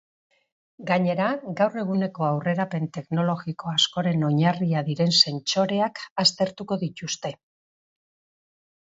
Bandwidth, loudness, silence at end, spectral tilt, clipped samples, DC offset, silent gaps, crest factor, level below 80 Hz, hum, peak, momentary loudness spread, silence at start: 8 kHz; -24 LUFS; 1.5 s; -5 dB/octave; under 0.1%; under 0.1%; 6.11-6.16 s; 22 dB; -68 dBFS; none; -2 dBFS; 9 LU; 0.8 s